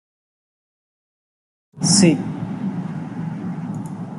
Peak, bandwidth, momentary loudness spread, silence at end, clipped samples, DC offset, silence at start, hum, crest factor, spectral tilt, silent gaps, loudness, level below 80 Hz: -2 dBFS; 11.5 kHz; 15 LU; 0 s; under 0.1%; under 0.1%; 1.75 s; none; 22 dB; -4.5 dB/octave; none; -21 LUFS; -60 dBFS